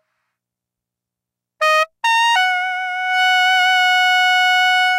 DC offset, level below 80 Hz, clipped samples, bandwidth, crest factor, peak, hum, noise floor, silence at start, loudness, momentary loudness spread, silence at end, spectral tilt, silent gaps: under 0.1%; -80 dBFS; under 0.1%; 16 kHz; 10 dB; -6 dBFS; none; -84 dBFS; 1.6 s; -14 LUFS; 6 LU; 0 s; 5.5 dB/octave; none